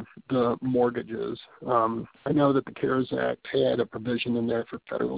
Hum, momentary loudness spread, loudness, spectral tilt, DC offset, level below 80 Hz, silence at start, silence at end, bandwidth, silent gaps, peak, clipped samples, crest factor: none; 9 LU; -27 LUFS; -10.5 dB/octave; under 0.1%; -60 dBFS; 0 s; 0 s; 4 kHz; none; -10 dBFS; under 0.1%; 18 dB